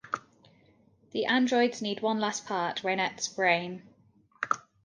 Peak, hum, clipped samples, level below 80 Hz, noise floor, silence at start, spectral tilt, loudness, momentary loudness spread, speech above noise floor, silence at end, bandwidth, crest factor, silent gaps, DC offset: -10 dBFS; none; under 0.1%; -76 dBFS; -63 dBFS; 0.05 s; -3.5 dB/octave; -29 LUFS; 12 LU; 35 dB; 0.25 s; 10 kHz; 20 dB; none; under 0.1%